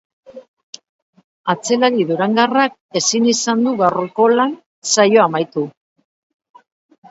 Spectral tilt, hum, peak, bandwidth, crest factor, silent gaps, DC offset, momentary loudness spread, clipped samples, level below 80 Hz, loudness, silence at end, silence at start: -3.5 dB/octave; none; 0 dBFS; 8 kHz; 18 dB; 0.48-0.57 s, 0.63-0.73 s, 0.89-1.13 s, 1.24-1.44 s, 2.81-2.89 s, 4.66-4.82 s; under 0.1%; 10 LU; under 0.1%; -68 dBFS; -16 LUFS; 1.4 s; 0.3 s